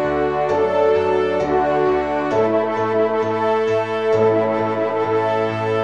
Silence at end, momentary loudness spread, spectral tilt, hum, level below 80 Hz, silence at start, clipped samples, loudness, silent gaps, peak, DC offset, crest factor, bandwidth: 0 s; 3 LU; -7 dB/octave; none; -48 dBFS; 0 s; under 0.1%; -18 LUFS; none; -4 dBFS; 0.3%; 14 dB; 7.6 kHz